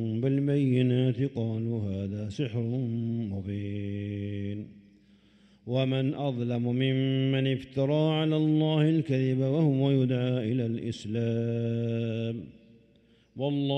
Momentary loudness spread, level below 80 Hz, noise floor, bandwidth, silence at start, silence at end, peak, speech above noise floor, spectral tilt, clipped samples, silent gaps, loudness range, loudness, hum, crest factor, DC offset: 9 LU; -68 dBFS; -62 dBFS; 8.4 kHz; 0 s; 0 s; -14 dBFS; 34 dB; -8.5 dB/octave; under 0.1%; none; 7 LU; -28 LUFS; none; 14 dB; under 0.1%